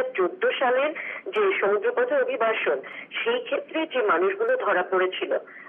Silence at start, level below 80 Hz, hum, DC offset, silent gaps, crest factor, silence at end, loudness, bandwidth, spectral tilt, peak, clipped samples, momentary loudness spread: 0 s; -90 dBFS; none; under 0.1%; none; 12 dB; 0 s; -24 LUFS; 3.7 kHz; -0.5 dB/octave; -12 dBFS; under 0.1%; 6 LU